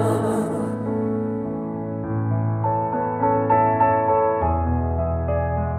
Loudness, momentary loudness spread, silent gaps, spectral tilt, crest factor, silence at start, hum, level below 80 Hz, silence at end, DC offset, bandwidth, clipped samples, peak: -22 LUFS; 8 LU; none; -9 dB/octave; 14 dB; 0 s; none; -36 dBFS; 0 s; under 0.1%; 13 kHz; under 0.1%; -8 dBFS